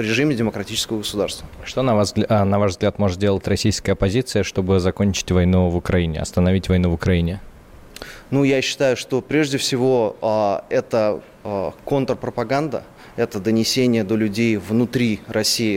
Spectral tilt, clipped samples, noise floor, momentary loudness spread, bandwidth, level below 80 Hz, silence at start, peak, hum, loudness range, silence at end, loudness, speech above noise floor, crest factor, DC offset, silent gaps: -5.5 dB/octave; under 0.1%; -42 dBFS; 8 LU; 16.5 kHz; -40 dBFS; 0 s; -8 dBFS; none; 2 LU; 0 s; -20 LUFS; 22 dB; 12 dB; under 0.1%; none